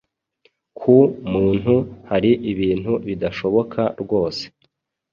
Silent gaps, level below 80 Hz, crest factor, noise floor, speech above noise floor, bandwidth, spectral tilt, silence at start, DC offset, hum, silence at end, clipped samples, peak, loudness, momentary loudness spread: none; -46 dBFS; 18 dB; -67 dBFS; 49 dB; 7.2 kHz; -8 dB/octave; 0.8 s; under 0.1%; none; 0.65 s; under 0.1%; -2 dBFS; -19 LUFS; 10 LU